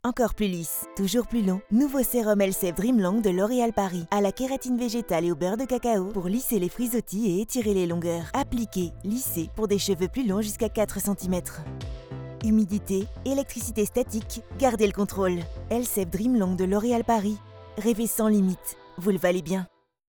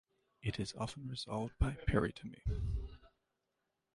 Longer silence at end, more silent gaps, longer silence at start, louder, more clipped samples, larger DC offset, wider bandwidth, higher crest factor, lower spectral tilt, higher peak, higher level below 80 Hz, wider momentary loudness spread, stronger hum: second, 0.4 s vs 0.85 s; neither; second, 0.05 s vs 0.45 s; first, -26 LUFS vs -40 LUFS; neither; neither; first, over 20 kHz vs 11.5 kHz; about the same, 18 dB vs 20 dB; about the same, -5.5 dB/octave vs -6 dB/octave; first, -8 dBFS vs -20 dBFS; about the same, -44 dBFS vs -46 dBFS; about the same, 7 LU vs 9 LU; neither